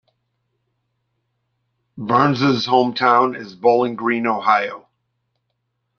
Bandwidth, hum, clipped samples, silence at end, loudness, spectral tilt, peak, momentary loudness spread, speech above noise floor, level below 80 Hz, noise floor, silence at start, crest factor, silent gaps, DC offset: 6.8 kHz; none; under 0.1%; 1.2 s; -17 LUFS; -6.5 dB/octave; -2 dBFS; 5 LU; 56 dB; -64 dBFS; -73 dBFS; 1.95 s; 18 dB; none; under 0.1%